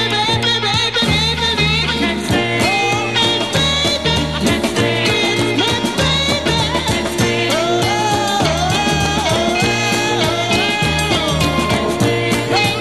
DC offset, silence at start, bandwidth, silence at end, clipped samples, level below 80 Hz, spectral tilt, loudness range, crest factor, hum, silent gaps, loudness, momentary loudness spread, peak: 0.6%; 0 s; 15 kHz; 0 s; under 0.1%; -32 dBFS; -4 dB/octave; 1 LU; 14 dB; none; none; -15 LUFS; 2 LU; -2 dBFS